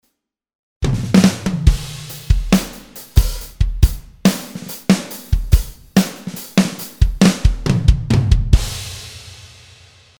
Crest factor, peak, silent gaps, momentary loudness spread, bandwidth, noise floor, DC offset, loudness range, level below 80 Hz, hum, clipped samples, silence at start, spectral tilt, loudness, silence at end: 16 dB; 0 dBFS; none; 15 LU; over 20 kHz; -72 dBFS; under 0.1%; 2 LU; -20 dBFS; none; 0.2%; 0.8 s; -5.5 dB/octave; -18 LUFS; 0.75 s